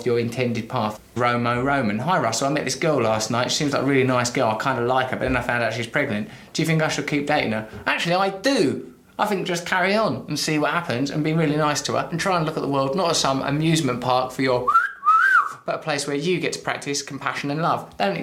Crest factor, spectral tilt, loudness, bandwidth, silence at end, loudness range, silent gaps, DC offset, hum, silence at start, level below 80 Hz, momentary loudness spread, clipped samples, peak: 18 dB; -4.5 dB/octave; -22 LUFS; 16 kHz; 0 s; 3 LU; none; under 0.1%; none; 0 s; -52 dBFS; 7 LU; under 0.1%; -4 dBFS